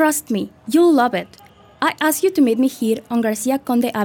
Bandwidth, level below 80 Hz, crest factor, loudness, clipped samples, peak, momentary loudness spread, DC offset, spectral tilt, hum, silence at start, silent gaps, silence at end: 19.5 kHz; -62 dBFS; 14 dB; -18 LUFS; under 0.1%; -2 dBFS; 9 LU; under 0.1%; -4 dB/octave; none; 0 s; none; 0 s